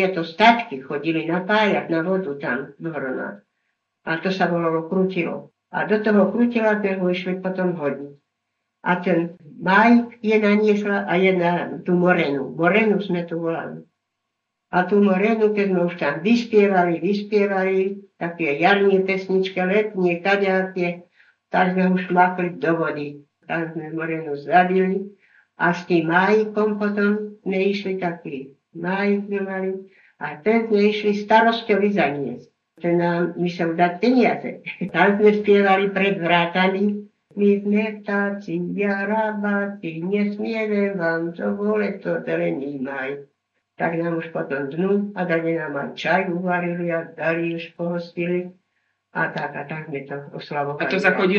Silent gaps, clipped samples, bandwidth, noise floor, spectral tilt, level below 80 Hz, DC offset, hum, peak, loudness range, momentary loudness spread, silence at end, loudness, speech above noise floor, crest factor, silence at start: none; under 0.1%; 7 kHz; -79 dBFS; -7.5 dB/octave; -74 dBFS; under 0.1%; none; -2 dBFS; 6 LU; 12 LU; 0 s; -21 LUFS; 58 dB; 20 dB; 0 s